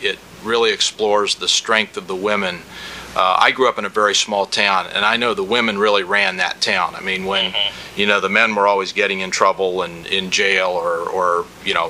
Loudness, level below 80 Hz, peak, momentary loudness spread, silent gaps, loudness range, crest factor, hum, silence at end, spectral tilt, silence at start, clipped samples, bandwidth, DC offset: -17 LUFS; -54 dBFS; 0 dBFS; 7 LU; none; 1 LU; 18 dB; none; 0 s; -2 dB/octave; 0 s; under 0.1%; 15.5 kHz; under 0.1%